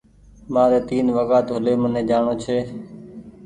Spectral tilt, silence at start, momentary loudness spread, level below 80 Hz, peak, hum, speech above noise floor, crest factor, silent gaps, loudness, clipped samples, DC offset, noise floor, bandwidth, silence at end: -7.5 dB/octave; 0.45 s; 19 LU; -50 dBFS; -4 dBFS; none; 20 dB; 16 dB; none; -20 LUFS; under 0.1%; under 0.1%; -39 dBFS; 9.8 kHz; 0 s